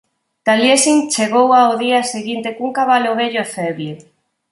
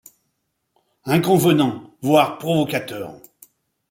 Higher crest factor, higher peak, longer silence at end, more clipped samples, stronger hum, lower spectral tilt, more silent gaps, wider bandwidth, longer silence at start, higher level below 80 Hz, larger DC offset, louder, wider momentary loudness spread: about the same, 16 dB vs 18 dB; about the same, 0 dBFS vs -2 dBFS; second, 0.5 s vs 0.75 s; neither; neither; second, -3 dB/octave vs -6 dB/octave; neither; second, 11.5 kHz vs 16.5 kHz; second, 0.45 s vs 1.05 s; about the same, -66 dBFS vs -62 dBFS; neither; first, -15 LUFS vs -19 LUFS; second, 11 LU vs 16 LU